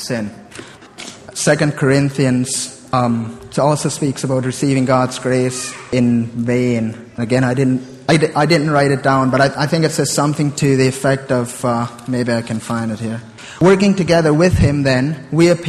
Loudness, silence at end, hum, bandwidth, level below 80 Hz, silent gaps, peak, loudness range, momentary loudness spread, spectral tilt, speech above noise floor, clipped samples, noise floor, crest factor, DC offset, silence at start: -16 LUFS; 0 s; none; 13.5 kHz; -40 dBFS; none; 0 dBFS; 3 LU; 10 LU; -5.5 dB/octave; 21 dB; under 0.1%; -36 dBFS; 16 dB; under 0.1%; 0 s